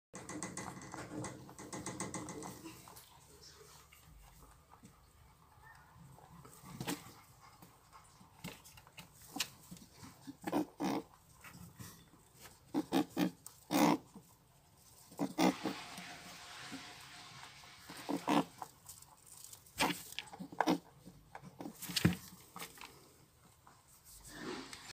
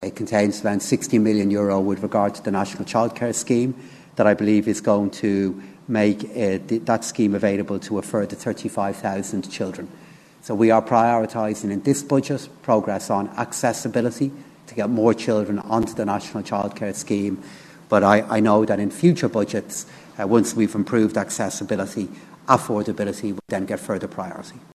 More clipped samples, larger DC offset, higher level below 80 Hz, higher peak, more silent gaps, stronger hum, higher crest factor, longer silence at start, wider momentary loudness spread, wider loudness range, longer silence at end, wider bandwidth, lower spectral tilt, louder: neither; neither; second, -70 dBFS vs -60 dBFS; second, -14 dBFS vs 0 dBFS; neither; neither; first, 28 dB vs 22 dB; first, 0.15 s vs 0 s; first, 25 LU vs 11 LU; first, 13 LU vs 3 LU; second, 0 s vs 0.2 s; first, 16 kHz vs 13.5 kHz; about the same, -4.5 dB/octave vs -5.5 dB/octave; second, -40 LUFS vs -22 LUFS